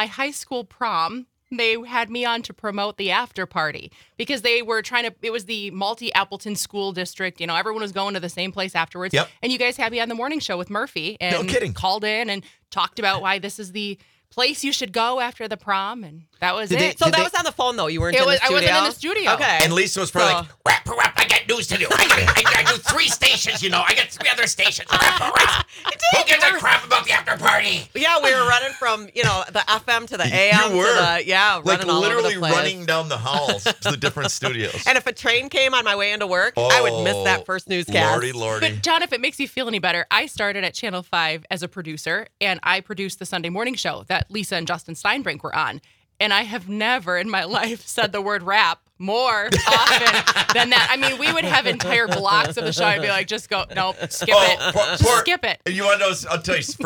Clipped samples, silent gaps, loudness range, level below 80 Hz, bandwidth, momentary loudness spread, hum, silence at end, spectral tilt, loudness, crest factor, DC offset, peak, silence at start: under 0.1%; none; 8 LU; -48 dBFS; 19.5 kHz; 11 LU; none; 0 s; -2.5 dB/octave; -19 LUFS; 20 dB; under 0.1%; 0 dBFS; 0 s